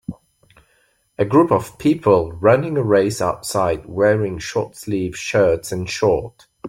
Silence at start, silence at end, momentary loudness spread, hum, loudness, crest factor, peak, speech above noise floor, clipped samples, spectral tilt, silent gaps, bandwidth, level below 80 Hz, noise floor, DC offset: 0.1 s; 0 s; 9 LU; none; -18 LUFS; 18 dB; -2 dBFS; 44 dB; under 0.1%; -6 dB/octave; none; 16.5 kHz; -48 dBFS; -61 dBFS; under 0.1%